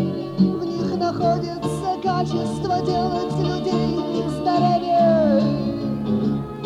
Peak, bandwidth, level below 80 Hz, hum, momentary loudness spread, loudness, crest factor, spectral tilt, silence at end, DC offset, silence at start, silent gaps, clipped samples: -6 dBFS; 12 kHz; -46 dBFS; none; 7 LU; -21 LUFS; 14 dB; -7.5 dB/octave; 0 s; under 0.1%; 0 s; none; under 0.1%